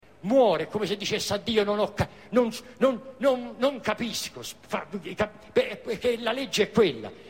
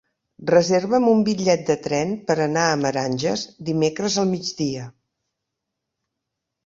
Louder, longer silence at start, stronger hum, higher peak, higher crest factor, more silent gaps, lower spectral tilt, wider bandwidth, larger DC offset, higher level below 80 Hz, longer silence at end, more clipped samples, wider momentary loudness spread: second, -27 LUFS vs -21 LUFS; second, 0.25 s vs 0.4 s; neither; second, -10 dBFS vs -2 dBFS; about the same, 16 dB vs 20 dB; neither; about the same, -4.5 dB/octave vs -5 dB/octave; first, 16.5 kHz vs 7.8 kHz; first, 0.1% vs under 0.1%; first, -56 dBFS vs -62 dBFS; second, 0 s vs 1.75 s; neither; about the same, 9 LU vs 9 LU